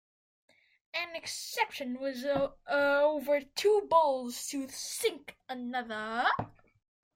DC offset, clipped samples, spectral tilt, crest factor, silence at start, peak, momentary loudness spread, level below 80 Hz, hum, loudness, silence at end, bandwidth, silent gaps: under 0.1%; under 0.1%; -3 dB/octave; 20 dB; 0.95 s; -14 dBFS; 11 LU; -68 dBFS; none; -31 LUFS; 0.7 s; 16.5 kHz; none